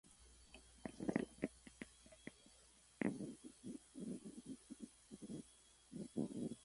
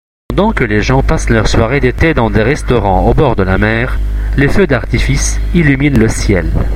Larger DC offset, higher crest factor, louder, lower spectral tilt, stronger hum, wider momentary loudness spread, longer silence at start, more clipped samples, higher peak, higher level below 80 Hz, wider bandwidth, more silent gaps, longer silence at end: neither; first, 28 dB vs 10 dB; second, -50 LUFS vs -12 LUFS; about the same, -5.5 dB/octave vs -6 dB/octave; neither; first, 20 LU vs 4 LU; second, 0.05 s vs 0.3 s; second, under 0.1% vs 0.1%; second, -22 dBFS vs 0 dBFS; second, -72 dBFS vs -16 dBFS; second, 11.5 kHz vs 13 kHz; neither; about the same, 0 s vs 0 s